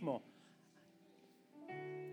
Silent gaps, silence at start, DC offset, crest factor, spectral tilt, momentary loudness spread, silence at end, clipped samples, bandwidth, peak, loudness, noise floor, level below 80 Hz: none; 0 s; under 0.1%; 22 dB; -7.5 dB/octave; 21 LU; 0 s; under 0.1%; over 20 kHz; -28 dBFS; -48 LUFS; -68 dBFS; under -90 dBFS